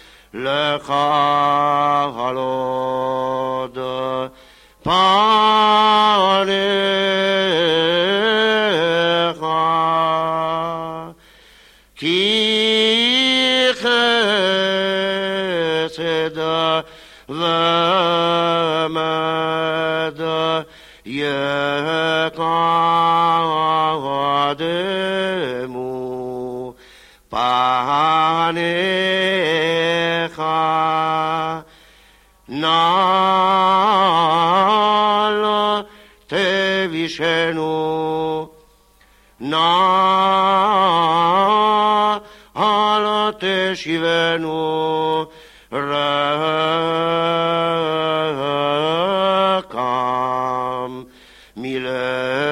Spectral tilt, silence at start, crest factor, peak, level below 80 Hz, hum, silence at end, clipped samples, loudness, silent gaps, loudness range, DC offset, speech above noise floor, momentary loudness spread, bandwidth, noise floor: -4.5 dB/octave; 0.35 s; 14 dB; -4 dBFS; -56 dBFS; none; 0 s; under 0.1%; -17 LUFS; none; 5 LU; under 0.1%; 34 dB; 10 LU; 15.5 kHz; -53 dBFS